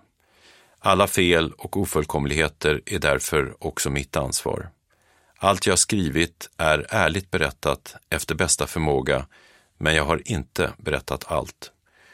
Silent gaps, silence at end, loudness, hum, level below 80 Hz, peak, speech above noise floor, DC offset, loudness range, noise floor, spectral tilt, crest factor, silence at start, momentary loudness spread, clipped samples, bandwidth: none; 0.45 s; -23 LUFS; none; -40 dBFS; -2 dBFS; 39 dB; under 0.1%; 3 LU; -62 dBFS; -3.5 dB/octave; 22 dB; 0.85 s; 9 LU; under 0.1%; 16.5 kHz